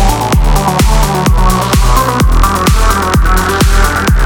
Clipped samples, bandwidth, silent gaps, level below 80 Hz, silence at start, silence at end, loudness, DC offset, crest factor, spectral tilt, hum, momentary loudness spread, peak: under 0.1%; 19.5 kHz; none; -10 dBFS; 0 s; 0 s; -10 LUFS; under 0.1%; 8 dB; -5 dB/octave; none; 1 LU; 0 dBFS